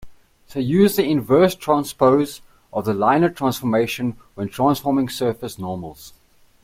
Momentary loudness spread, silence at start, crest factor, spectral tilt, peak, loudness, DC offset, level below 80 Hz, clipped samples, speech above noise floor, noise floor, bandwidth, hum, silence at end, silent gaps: 13 LU; 0 s; 16 dB; -6 dB/octave; -4 dBFS; -20 LUFS; under 0.1%; -54 dBFS; under 0.1%; 23 dB; -42 dBFS; 16.5 kHz; none; 0.55 s; none